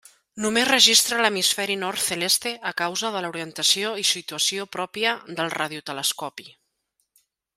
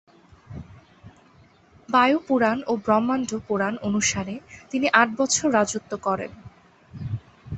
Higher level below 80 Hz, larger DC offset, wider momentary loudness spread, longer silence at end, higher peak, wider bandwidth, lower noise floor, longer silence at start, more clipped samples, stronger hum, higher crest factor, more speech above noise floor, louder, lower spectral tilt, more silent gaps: second, -70 dBFS vs -54 dBFS; neither; second, 14 LU vs 18 LU; first, 1.05 s vs 0 s; about the same, -2 dBFS vs -2 dBFS; first, 16 kHz vs 8.6 kHz; first, -74 dBFS vs -55 dBFS; second, 0.35 s vs 0.5 s; neither; neither; about the same, 24 dB vs 22 dB; first, 50 dB vs 32 dB; about the same, -21 LUFS vs -23 LUFS; second, -1 dB/octave vs -3.5 dB/octave; neither